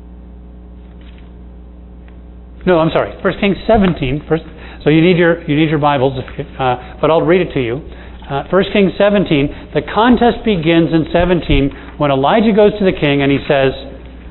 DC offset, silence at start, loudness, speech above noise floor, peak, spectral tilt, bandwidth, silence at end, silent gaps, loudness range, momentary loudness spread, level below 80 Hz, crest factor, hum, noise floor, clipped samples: under 0.1%; 0 s; -13 LUFS; 21 dB; 0 dBFS; -10.5 dB/octave; 4.2 kHz; 0 s; none; 4 LU; 10 LU; -30 dBFS; 14 dB; none; -34 dBFS; under 0.1%